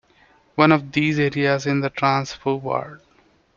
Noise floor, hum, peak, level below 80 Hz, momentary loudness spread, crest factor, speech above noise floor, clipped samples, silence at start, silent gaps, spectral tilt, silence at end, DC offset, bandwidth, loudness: -58 dBFS; none; -2 dBFS; -58 dBFS; 10 LU; 20 dB; 38 dB; under 0.1%; 0.55 s; none; -6.5 dB/octave; 0.6 s; under 0.1%; 7.4 kHz; -20 LUFS